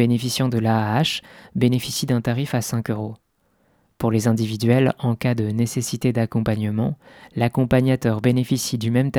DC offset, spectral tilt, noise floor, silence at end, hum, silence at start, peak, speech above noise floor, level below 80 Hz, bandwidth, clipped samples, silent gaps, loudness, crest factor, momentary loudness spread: under 0.1%; -6 dB/octave; -64 dBFS; 0 s; none; 0 s; -4 dBFS; 44 dB; -50 dBFS; 17.5 kHz; under 0.1%; none; -21 LUFS; 16 dB; 8 LU